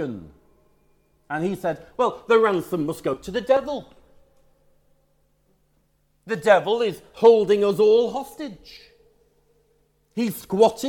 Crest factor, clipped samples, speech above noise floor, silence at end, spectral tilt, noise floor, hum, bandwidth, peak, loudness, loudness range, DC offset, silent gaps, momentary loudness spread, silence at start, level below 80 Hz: 20 dB; under 0.1%; 44 dB; 0 s; -5.5 dB/octave; -65 dBFS; none; 18 kHz; -2 dBFS; -21 LUFS; 8 LU; under 0.1%; none; 16 LU; 0 s; -58 dBFS